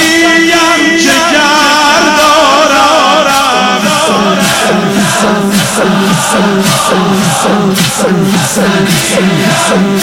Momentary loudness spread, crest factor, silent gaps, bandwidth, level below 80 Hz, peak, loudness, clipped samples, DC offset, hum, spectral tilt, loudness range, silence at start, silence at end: 4 LU; 8 dB; none; 17 kHz; -40 dBFS; 0 dBFS; -7 LUFS; 0.2%; under 0.1%; none; -3.5 dB/octave; 3 LU; 0 s; 0 s